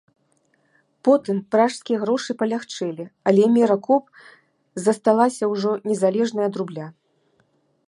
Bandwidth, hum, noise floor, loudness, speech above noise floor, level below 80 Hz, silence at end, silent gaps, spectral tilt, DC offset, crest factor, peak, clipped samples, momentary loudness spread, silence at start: 11.5 kHz; none; -65 dBFS; -21 LUFS; 45 dB; -76 dBFS; 0.95 s; none; -6 dB/octave; under 0.1%; 18 dB; -4 dBFS; under 0.1%; 11 LU; 1.05 s